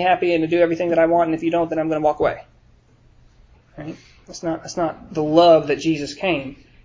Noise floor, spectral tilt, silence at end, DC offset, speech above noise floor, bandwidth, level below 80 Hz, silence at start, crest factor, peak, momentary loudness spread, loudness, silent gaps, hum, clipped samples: -53 dBFS; -6 dB/octave; 0.3 s; under 0.1%; 34 dB; 7.6 kHz; -52 dBFS; 0 s; 18 dB; -2 dBFS; 21 LU; -19 LUFS; none; none; under 0.1%